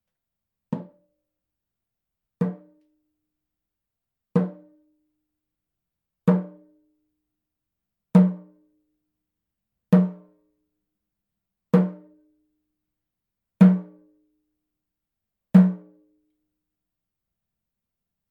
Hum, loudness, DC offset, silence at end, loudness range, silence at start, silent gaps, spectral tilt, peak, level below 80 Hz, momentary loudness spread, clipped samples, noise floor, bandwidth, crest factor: none; -21 LUFS; under 0.1%; 2.55 s; 11 LU; 0.7 s; none; -10.5 dB/octave; -2 dBFS; -74 dBFS; 17 LU; under 0.1%; -86 dBFS; 4.2 kHz; 24 dB